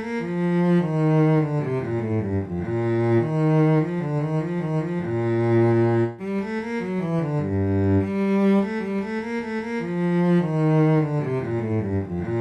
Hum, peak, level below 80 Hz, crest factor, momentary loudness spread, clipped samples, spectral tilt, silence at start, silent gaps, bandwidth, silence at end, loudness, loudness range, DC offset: none; -10 dBFS; -56 dBFS; 12 dB; 8 LU; under 0.1%; -9.5 dB/octave; 0 s; none; 8.4 kHz; 0 s; -23 LUFS; 2 LU; under 0.1%